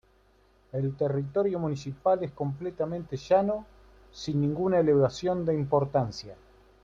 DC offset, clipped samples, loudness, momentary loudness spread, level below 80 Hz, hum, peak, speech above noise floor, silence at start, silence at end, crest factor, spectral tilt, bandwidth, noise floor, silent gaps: under 0.1%; under 0.1%; -28 LUFS; 11 LU; -58 dBFS; none; -12 dBFS; 35 dB; 0.75 s; 0.5 s; 16 dB; -7.5 dB/octave; 7.6 kHz; -63 dBFS; none